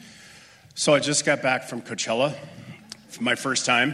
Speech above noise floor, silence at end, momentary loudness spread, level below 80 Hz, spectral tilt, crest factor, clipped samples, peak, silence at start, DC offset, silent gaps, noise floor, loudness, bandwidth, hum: 26 dB; 0 s; 21 LU; -68 dBFS; -3 dB/octave; 18 dB; under 0.1%; -6 dBFS; 0 s; under 0.1%; none; -50 dBFS; -23 LUFS; 14.5 kHz; none